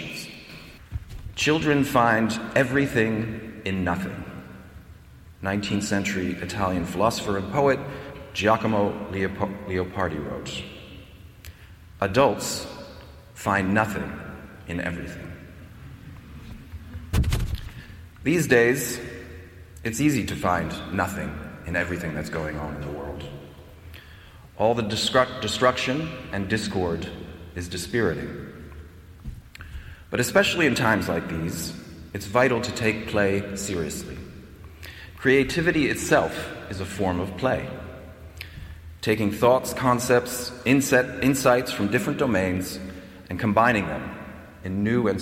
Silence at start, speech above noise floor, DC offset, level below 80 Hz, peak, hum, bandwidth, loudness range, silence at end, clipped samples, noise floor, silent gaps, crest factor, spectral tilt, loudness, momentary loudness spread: 0 s; 23 dB; under 0.1%; -44 dBFS; -6 dBFS; none; 16.5 kHz; 7 LU; 0 s; under 0.1%; -47 dBFS; none; 20 dB; -5 dB/octave; -24 LUFS; 22 LU